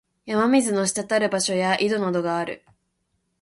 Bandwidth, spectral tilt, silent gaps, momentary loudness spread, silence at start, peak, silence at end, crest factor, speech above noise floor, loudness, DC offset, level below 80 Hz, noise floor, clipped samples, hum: 11.5 kHz; -4 dB/octave; none; 8 LU; 0.25 s; -6 dBFS; 0.85 s; 16 dB; 51 dB; -22 LUFS; under 0.1%; -66 dBFS; -73 dBFS; under 0.1%; none